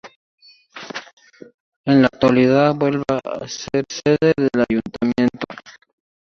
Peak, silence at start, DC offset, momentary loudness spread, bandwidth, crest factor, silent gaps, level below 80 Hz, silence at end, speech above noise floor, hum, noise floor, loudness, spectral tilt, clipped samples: -2 dBFS; 0.05 s; under 0.1%; 17 LU; 7.2 kHz; 18 dB; 0.16-0.38 s, 1.13-1.17 s, 1.54-1.84 s; -52 dBFS; 0.6 s; 22 dB; none; -40 dBFS; -18 LUFS; -6 dB/octave; under 0.1%